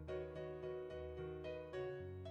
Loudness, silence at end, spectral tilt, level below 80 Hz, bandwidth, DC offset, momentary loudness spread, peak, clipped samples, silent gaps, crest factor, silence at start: -49 LUFS; 0 s; -8 dB/octave; -64 dBFS; 8.2 kHz; under 0.1%; 2 LU; -36 dBFS; under 0.1%; none; 12 dB; 0 s